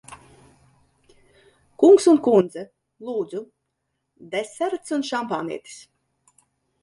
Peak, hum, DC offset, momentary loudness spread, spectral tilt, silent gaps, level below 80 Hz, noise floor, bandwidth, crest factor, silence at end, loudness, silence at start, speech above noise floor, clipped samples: -4 dBFS; none; under 0.1%; 24 LU; -5.5 dB/octave; none; -66 dBFS; -77 dBFS; 11.5 kHz; 20 dB; 1.05 s; -21 LUFS; 0.1 s; 57 dB; under 0.1%